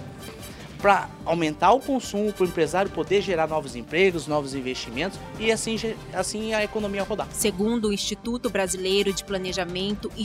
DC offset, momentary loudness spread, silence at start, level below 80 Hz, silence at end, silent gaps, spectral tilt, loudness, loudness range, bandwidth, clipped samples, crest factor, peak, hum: under 0.1%; 8 LU; 0 s; -48 dBFS; 0 s; none; -4 dB/octave; -25 LUFS; 3 LU; 16 kHz; under 0.1%; 20 dB; -4 dBFS; none